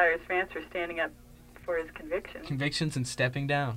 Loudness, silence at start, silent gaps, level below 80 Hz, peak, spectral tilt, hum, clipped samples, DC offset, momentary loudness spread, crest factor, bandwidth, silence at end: -32 LUFS; 0 s; none; -54 dBFS; -12 dBFS; -5 dB/octave; 60 Hz at -55 dBFS; under 0.1%; under 0.1%; 7 LU; 20 dB; 16 kHz; 0 s